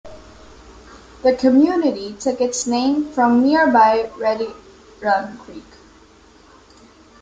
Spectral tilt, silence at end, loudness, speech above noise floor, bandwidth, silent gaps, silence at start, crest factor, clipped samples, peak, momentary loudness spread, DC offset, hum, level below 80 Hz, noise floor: -4 dB/octave; 1.6 s; -17 LUFS; 31 dB; 9.4 kHz; none; 0.05 s; 16 dB; under 0.1%; -2 dBFS; 12 LU; under 0.1%; none; -52 dBFS; -48 dBFS